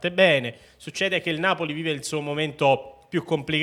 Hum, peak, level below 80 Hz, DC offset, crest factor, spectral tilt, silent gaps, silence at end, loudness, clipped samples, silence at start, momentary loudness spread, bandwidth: none; -4 dBFS; -62 dBFS; under 0.1%; 22 dB; -4.5 dB/octave; none; 0 s; -24 LUFS; under 0.1%; 0 s; 11 LU; 14 kHz